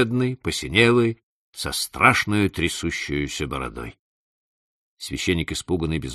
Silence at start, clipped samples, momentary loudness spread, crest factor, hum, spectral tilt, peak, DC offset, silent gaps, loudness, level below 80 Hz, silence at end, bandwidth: 0 s; under 0.1%; 16 LU; 22 dB; none; -4.5 dB/octave; 0 dBFS; under 0.1%; 1.23-1.53 s, 3.99-4.97 s; -22 LUFS; -42 dBFS; 0 s; 13 kHz